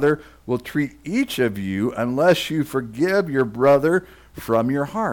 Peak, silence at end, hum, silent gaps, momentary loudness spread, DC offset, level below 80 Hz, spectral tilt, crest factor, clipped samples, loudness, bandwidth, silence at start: -8 dBFS; 0 s; none; none; 9 LU; under 0.1%; -52 dBFS; -6 dB/octave; 14 dB; under 0.1%; -21 LUFS; 18.5 kHz; 0 s